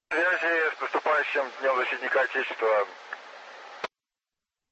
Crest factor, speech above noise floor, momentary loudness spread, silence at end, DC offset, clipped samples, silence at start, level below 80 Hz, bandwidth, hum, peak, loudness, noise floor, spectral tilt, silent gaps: 16 dB; over 63 dB; 17 LU; 0.85 s; under 0.1%; under 0.1%; 0.1 s; -84 dBFS; 8.4 kHz; none; -14 dBFS; -26 LUFS; under -90 dBFS; -2 dB/octave; none